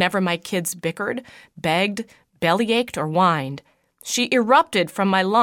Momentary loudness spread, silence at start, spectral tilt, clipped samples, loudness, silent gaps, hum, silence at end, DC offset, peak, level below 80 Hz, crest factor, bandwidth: 16 LU; 0 s; -4 dB/octave; under 0.1%; -21 LUFS; none; none; 0 s; under 0.1%; -2 dBFS; -64 dBFS; 18 dB; 17.5 kHz